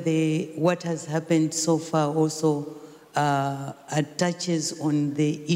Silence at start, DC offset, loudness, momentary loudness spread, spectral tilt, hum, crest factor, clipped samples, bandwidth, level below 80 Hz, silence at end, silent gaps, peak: 0 s; under 0.1%; -25 LUFS; 7 LU; -5.5 dB/octave; none; 14 dB; under 0.1%; 16 kHz; -70 dBFS; 0 s; none; -10 dBFS